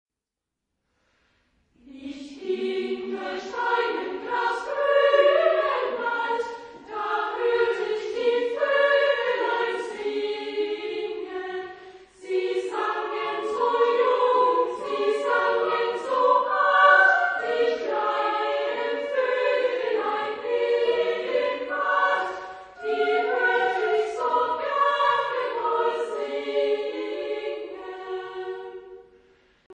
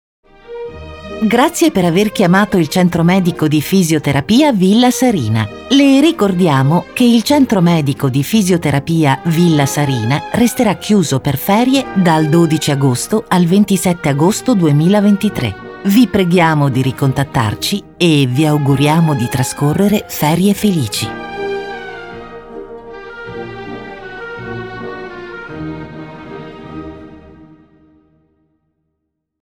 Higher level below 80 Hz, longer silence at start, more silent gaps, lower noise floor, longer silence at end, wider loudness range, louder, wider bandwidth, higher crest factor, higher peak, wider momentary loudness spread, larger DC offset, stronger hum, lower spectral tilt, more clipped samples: second, -68 dBFS vs -44 dBFS; first, 1.85 s vs 0.5 s; first, 29.66-29.70 s vs none; first, -87 dBFS vs -72 dBFS; second, 0.05 s vs 2.3 s; second, 9 LU vs 16 LU; second, -24 LUFS vs -13 LUFS; second, 9.6 kHz vs over 20 kHz; first, 20 dB vs 14 dB; second, -4 dBFS vs 0 dBFS; second, 14 LU vs 18 LU; neither; neither; second, -3 dB/octave vs -6 dB/octave; neither